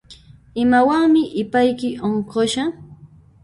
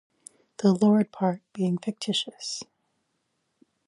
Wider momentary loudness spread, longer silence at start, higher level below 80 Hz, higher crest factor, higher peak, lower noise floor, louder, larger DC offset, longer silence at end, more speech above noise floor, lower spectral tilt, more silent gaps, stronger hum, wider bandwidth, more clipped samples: second, 9 LU vs 14 LU; second, 0.1 s vs 0.6 s; first, -52 dBFS vs -76 dBFS; about the same, 16 dB vs 18 dB; first, -4 dBFS vs -10 dBFS; second, -46 dBFS vs -76 dBFS; first, -18 LUFS vs -26 LUFS; neither; second, 0.35 s vs 1.25 s; second, 28 dB vs 51 dB; about the same, -5 dB/octave vs -5.5 dB/octave; neither; neither; about the same, 11.5 kHz vs 11 kHz; neither